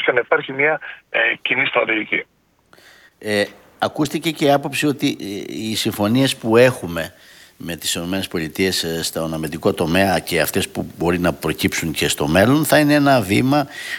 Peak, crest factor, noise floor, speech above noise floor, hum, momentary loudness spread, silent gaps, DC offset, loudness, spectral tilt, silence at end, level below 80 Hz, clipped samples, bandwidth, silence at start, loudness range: 0 dBFS; 18 dB; -53 dBFS; 34 dB; none; 11 LU; none; under 0.1%; -18 LUFS; -4.5 dB/octave; 0 s; -48 dBFS; under 0.1%; 18.5 kHz; 0 s; 4 LU